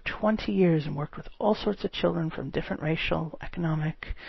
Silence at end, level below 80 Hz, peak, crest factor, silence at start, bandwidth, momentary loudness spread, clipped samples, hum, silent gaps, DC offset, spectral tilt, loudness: 0 s; -44 dBFS; -12 dBFS; 18 dB; 0.05 s; 6 kHz; 9 LU; under 0.1%; none; none; 0.1%; -5.5 dB/octave; -29 LUFS